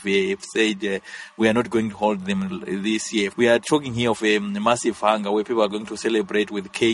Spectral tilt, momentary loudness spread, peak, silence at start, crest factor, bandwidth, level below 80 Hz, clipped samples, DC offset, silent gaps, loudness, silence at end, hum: -4.5 dB/octave; 7 LU; -4 dBFS; 0 s; 18 dB; 11.5 kHz; -58 dBFS; under 0.1%; under 0.1%; none; -22 LUFS; 0 s; none